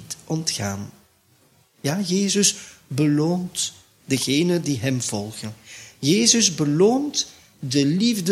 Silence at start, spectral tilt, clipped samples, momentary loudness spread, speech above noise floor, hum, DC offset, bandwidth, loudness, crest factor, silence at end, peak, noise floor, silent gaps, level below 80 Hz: 0 s; -4 dB/octave; under 0.1%; 16 LU; 38 dB; none; under 0.1%; 16 kHz; -21 LUFS; 20 dB; 0 s; -4 dBFS; -59 dBFS; none; -62 dBFS